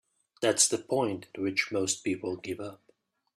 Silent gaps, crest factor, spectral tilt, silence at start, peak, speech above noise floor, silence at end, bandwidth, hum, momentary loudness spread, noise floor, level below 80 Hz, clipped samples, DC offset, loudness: none; 22 dB; -2.5 dB/octave; 0.4 s; -8 dBFS; 39 dB; 0.6 s; 15 kHz; none; 13 LU; -69 dBFS; -74 dBFS; under 0.1%; under 0.1%; -29 LUFS